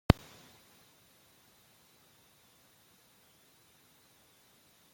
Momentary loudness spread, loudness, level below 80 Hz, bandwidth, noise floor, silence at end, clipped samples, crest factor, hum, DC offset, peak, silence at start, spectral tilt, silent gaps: 7 LU; -30 LUFS; -50 dBFS; 16.5 kHz; -65 dBFS; 4.8 s; under 0.1%; 36 dB; none; under 0.1%; -2 dBFS; 0.1 s; -6.5 dB/octave; none